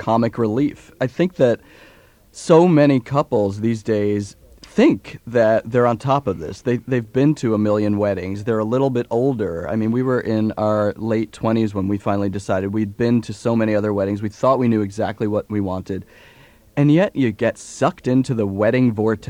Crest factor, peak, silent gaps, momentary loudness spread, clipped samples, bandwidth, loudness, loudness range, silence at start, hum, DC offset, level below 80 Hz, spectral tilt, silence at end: 18 dB; 0 dBFS; none; 7 LU; under 0.1%; 11 kHz; -19 LUFS; 3 LU; 0 s; none; under 0.1%; -52 dBFS; -7.5 dB/octave; 0 s